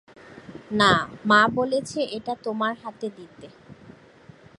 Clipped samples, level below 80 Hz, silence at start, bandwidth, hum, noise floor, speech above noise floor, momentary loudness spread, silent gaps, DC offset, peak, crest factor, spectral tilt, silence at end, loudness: under 0.1%; -56 dBFS; 0.3 s; 11.5 kHz; none; -50 dBFS; 27 dB; 18 LU; none; under 0.1%; -4 dBFS; 22 dB; -4.5 dB/octave; 0.85 s; -23 LUFS